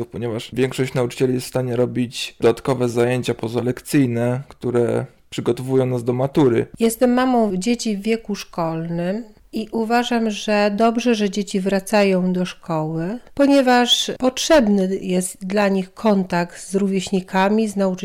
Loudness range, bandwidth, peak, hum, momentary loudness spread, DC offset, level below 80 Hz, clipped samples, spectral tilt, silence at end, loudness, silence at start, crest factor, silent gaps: 4 LU; 18 kHz; -8 dBFS; none; 9 LU; under 0.1%; -50 dBFS; under 0.1%; -5.5 dB/octave; 0 s; -19 LUFS; 0 s; 12 dB; none